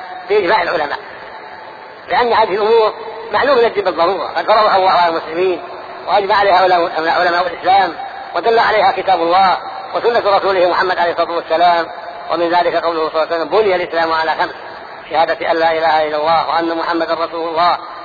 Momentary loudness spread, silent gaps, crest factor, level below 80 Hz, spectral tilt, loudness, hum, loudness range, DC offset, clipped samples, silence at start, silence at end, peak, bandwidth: 12 LU; none; 14 dB; -52 dBFS; -5.5 dB/octave; -14 LUFS; none; 3 LU; under 0.1%; under 0.1%; 0 s; 0 s; -2 dBFS; 5 kHz